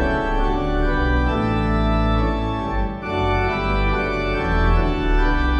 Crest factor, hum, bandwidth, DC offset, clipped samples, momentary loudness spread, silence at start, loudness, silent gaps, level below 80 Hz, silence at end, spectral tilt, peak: 12 dB; none; 7 kHz; under 0.1%; under 0.1%; 4 LU; 0 s; -21 LUFS; none; -22 dBFS; 0 s; -7.5 dB/octave; -6 dBFS